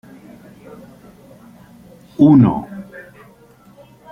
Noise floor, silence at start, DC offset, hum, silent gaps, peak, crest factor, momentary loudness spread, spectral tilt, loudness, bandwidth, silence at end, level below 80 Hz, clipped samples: -47 dBFS; 2.2 s; under 0.1%; none; none; -2 dBFS; 18 dB; 27 LU; -10 dB/octave; -13 LUFS; 3.9 kHz; 1.1 s; -52 dBFS; under 0.1%